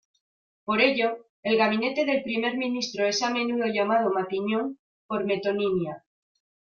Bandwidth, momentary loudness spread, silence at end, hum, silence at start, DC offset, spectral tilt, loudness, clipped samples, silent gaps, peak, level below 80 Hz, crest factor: 7.2 kHz; 9 LU; 0.75 s; none; 0.65 s; under 0.1%; -4.5 dB/octave; -26 LUFS; under 0.1%; 1.30-1.43 s, 4.79-5.09 s; -8 dBFS; -70 dBFS; 20 dB